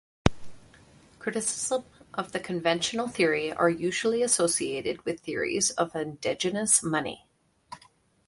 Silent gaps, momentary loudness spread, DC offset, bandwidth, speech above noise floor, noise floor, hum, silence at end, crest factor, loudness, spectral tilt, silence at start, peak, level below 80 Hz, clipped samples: none; 14 LU; under 0.1%; 11.5 kHz; 33 dB; -61 dBFS; none; 0.5 s; 28 dB; -27 LUFS; -3 dB/octave; 0.25 s; 0 dBFS; -50 dBFS; under 0.1%